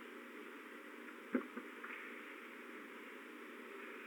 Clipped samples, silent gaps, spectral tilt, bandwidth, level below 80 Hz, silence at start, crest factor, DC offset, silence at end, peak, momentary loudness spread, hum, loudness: under 0.1%; none; -4 dB/octave; 19 kHz; under -90 dBFS; 0 s; 26 dB; under 0.1%; 0 s; -24 dBFS; 9 LU; none; -49 LUFS